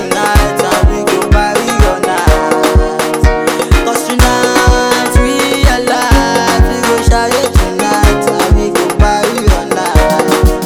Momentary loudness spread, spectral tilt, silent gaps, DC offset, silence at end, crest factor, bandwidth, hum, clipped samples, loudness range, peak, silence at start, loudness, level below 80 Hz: 3 LU; -4.5 dB/octave; none; under 0.1%; 0 s; 10 dB; 18 kHz; none; 1%; 1 LU; 0 dBFS; 0 s; -10 LUFS; -14 dBFS